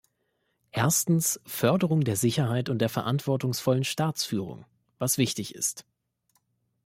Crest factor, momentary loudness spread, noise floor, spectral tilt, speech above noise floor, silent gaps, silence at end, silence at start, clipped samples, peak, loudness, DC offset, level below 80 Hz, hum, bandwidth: 18 dB; 8 LU; -75 dBFS; -4.5 dB/octave; 49 dB; none; 1.05 s; 0.75 s; under 0.1%; -10 dBFS; -27 LUFS; under 0.1%; -66 dBFS; none; 16.5 kHz